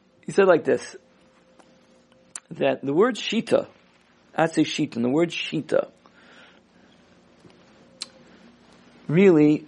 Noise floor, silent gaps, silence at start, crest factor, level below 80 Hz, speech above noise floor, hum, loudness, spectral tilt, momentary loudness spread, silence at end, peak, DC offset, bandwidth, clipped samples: -58 dBFS; none; 0.3 s; 20 dB; -70 dBFS; 37 dB; 60 Hz at -55 dBFS; -22 LUFS; -6 dB/octave; 21 LU; 0.05 s; -4 dBFS; under 0.1%; 11.5 kHz; under 0.1%